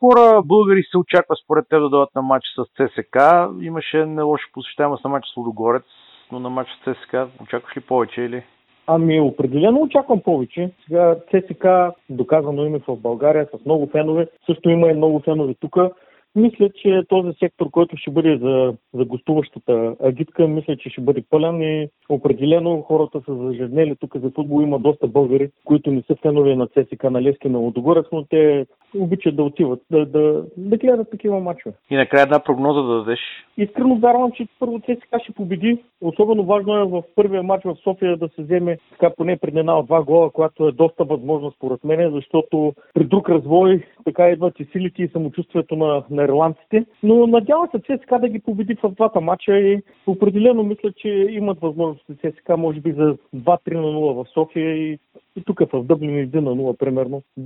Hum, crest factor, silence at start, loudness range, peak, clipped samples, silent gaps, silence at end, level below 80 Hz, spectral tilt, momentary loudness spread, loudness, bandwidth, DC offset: none; 18 dB; 0 s; 3 LU; 0 dBFS; under 0.1%; none; 0 s; -60 dBFS; -9.5 dB/octave; 10 LU; -18 LUFS; 4.1 kHz; under 0.1%